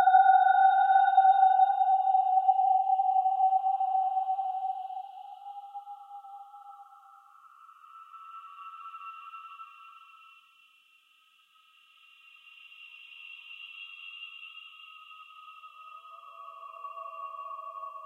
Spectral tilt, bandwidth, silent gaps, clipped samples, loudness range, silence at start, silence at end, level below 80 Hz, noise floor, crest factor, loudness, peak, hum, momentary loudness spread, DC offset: 2 dB/octave; 3.9 kHz; none; under 0.1%; 24 LU; 0 s; 0 s; under -90 dBFS; -65 dBFS; 18 dB; -24 LUFS; -10 dBFS; none; 26 LU; under 0.1%